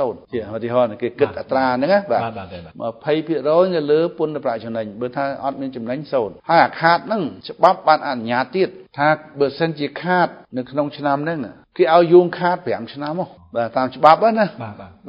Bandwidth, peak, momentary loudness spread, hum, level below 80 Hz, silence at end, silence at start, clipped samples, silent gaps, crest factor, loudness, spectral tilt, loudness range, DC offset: 5.8 kHz; 0 dBFS; 13 LU; none; -58 dBFS; 0 s; 0 s; under 0.1%; none; 18 dB; -19 LUFS; -8 dB/octave; 4 LU; under 0.1%